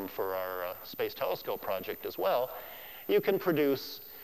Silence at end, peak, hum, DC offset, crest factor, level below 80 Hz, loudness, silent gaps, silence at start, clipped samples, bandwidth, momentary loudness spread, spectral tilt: 0 s; -16 dBFS; none; 0.1%; 18 dB; -68 dBFS; -33 LUFS; none; 0 s; under 0.1%; 15.5 kHz; 11 LU; -5.5 dB/octave